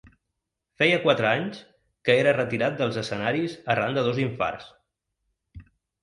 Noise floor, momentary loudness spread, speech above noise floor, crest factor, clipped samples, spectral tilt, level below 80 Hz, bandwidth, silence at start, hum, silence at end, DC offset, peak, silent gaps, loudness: -82 dBFS; 9 LU; 58 dB; 20 dB; under 0.1%; -6 dB/octave; -60 dBFS; 11 kHz; 0.8 s; none; 0.4 s; under 0.1%; -6 dBFS; none; -24 LUFS